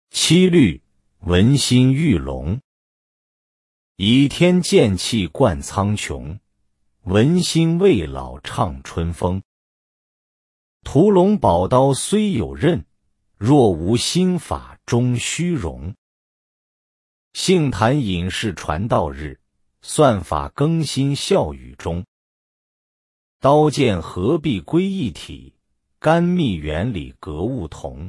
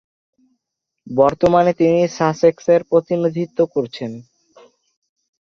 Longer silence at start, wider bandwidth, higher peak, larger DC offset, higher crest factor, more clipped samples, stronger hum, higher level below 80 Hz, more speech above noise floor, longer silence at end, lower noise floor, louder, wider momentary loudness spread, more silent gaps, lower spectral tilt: second, 0.15 s vs 1.05 s; first, 12 kHz vs 7 kHz; about the same, -2 dBFS vs -2 dBFS; neither; about the same, 16 dB vs 16 dB; neither; neither; first, -42 dBFS vs -54 dBFS; second, 48 dB vs 63 dB; second, 0 s vs 1.35 s; second, -66 dBFS vs -79 dBFS; about the same, -18 LUFS vs -17 LUFS; about the same, 14 LU vs 12 LU; first, 2.64-3.95 s, 9.45-10.80 s, 15.98-17.31 s, 22.08-23.40 s vs none; second, -5.5 dB/octave vs -7 dB/octave